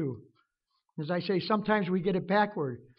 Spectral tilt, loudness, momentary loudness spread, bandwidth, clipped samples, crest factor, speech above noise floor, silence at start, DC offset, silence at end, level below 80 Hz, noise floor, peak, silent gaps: -5 dB/octave; -29 LUFS; 13 LU; 5.6 kHz; under 0.1%; 18 dB; 50 dB; 0 s; under 0.1%; 0.15 s; -66 dBFS; -79 dBFS; -12 dBFS; none